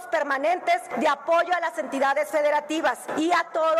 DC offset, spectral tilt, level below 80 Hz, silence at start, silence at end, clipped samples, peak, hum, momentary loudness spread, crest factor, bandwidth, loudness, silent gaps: under 0.1%; -2.5 dB/octave; -72 dBFS; 0 s; 0 s; under 0.1%; -12 dBFS; none; 4 LU; 12 dB; 15 kHz; -24 LUFS; none